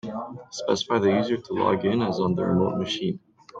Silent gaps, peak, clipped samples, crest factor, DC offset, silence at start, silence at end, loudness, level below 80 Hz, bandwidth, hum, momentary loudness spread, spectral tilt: none; -8 dBFS; under 0.1%; 18 dB; under 0.1%; 0.05 s; 0 s; -25 LUFS; -62 dBFS; 7.8 kHz; none; 12 LU; -6 dB/octave